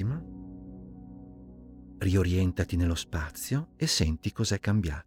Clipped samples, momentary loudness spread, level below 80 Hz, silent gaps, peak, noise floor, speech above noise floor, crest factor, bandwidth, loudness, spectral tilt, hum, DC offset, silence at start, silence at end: under 0.1%; 22 LU; -44 dBFS; none; -12 dBFS; -48 dBFS; 20 dB; 18 dB; 17 kHz; -29 LUFS; -5 dB/octave; none; under 0.1%; 0 s; 0.05 s